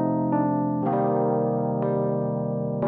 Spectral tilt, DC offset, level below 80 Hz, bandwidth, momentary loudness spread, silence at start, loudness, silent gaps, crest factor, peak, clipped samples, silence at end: -11 dB/octave; under 0.1%; -64 dBFS; 3.3 kHz; 4 LU; 0 s; -24 LUFS; none; 12 dB; -12 dBFS; under 0.1%; 0 s